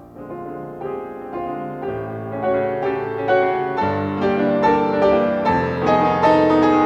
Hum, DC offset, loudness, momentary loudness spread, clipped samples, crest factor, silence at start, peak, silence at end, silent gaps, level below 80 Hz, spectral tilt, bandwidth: none; under 0.1%; -19 LUFS; 15 LU; under 0.1%; 14 dB; 0 s; -4 dBFS; 0 s; none; -50 dBFS; -7.5 dB/octave; 8 kHz